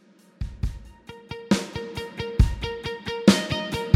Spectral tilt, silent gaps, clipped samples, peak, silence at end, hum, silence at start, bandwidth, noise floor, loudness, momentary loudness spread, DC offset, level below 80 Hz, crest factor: -5.5 dB/octave; none; under 0.1%; -2 dBFS; 0 s; none; 0.4 s; 15 kHz; -45 dBFS; -25 LUFS; 20 LU; under 0.1%; -32 dBFS; 22 dB